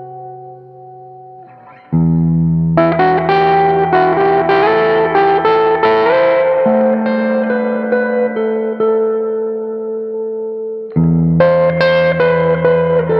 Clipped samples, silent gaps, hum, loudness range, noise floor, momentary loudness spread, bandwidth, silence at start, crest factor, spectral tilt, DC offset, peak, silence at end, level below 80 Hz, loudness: under 0.1%; none; none; 5 LU; -39 dBFS; 10 LU; 5.6 kHz; 0 s; 14 dB; -9.5 dB/octave; under 0.1%; 0 dBFS; 0 s; -42 dBFS; -13 LUFS